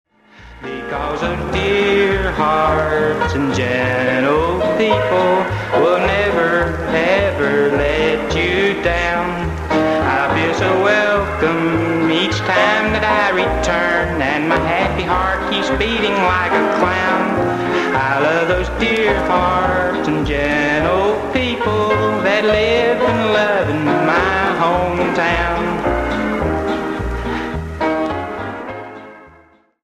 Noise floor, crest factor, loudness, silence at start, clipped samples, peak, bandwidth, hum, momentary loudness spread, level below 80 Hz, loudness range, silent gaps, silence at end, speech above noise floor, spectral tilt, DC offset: -50 dBFS; 16 dB; -16 LUFS; 0.4 s; under 0.1%; 0 dBFS; 14.5 kHz; none; 6 LU; -32 dBFS; 2 LU; none; 0.55 s; 34 dB; -5.5 dB/octave; under 0.1%